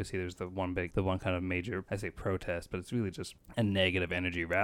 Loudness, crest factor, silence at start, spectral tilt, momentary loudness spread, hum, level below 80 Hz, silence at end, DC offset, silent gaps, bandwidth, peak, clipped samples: -34 LUFS; 20 dB; 0 s; -6 dB/octave; 9 LU; none; -54 dBFS; 0 s; under 0.1%; none; 15.5 kHz; -14 dBFS; under 0.1%